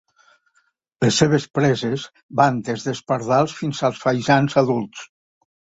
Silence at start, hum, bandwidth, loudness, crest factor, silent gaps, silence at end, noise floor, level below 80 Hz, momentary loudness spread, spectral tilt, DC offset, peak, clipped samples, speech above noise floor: 1 s; none; 8 kHz; -20 LUFS; 20 dB; 2.23-2.29 s; 0.7 s; -66 dBFS; -56 dBFS; 9 LU; -5.5 dB/octave; under 0.1%; -2 dBFS; under 0.1%; 46 dB